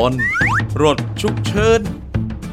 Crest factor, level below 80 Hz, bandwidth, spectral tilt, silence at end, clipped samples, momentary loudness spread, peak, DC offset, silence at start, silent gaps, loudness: 16 dB; -32 dBFS; 14.5 kHz; -5.5 dB/octave; 0 s; under 0.1%; 9 LU; 0 dBFS; under 0.1%; 0 s; none; -17 LUFS